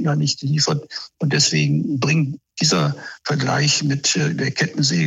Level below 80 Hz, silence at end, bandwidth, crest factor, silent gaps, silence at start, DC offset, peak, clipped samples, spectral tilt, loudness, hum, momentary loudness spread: -60 dBFS; 0 s; 8.2 kHz; 16 dB; none; 0 s; under 0.1%; -4 dBFS; under 0.1%; -4 dB/octave; -19 LUFS; none; 8 LU